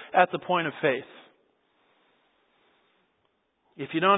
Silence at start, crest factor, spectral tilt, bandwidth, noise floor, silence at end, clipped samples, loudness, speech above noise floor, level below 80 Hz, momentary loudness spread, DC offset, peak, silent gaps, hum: 0 s; 24 dB; -9 dB/octave; 4 kHz; -73 dBFS; 0 s; under 0.1%; -27 LUFS; 48 dB; -80 dBFS; 15 LU; under 0.1%; -4 dBFS; none; none